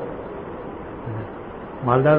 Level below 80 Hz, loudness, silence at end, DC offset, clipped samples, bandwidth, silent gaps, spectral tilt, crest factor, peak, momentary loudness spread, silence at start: -46 dBFS; -28 LUFS; 0 s; under 0.1%; under 0.1%; 4.2 kHz; none; -12.5 dB/octave; 20 dB; -4 dBFS; 13 LU; 0 s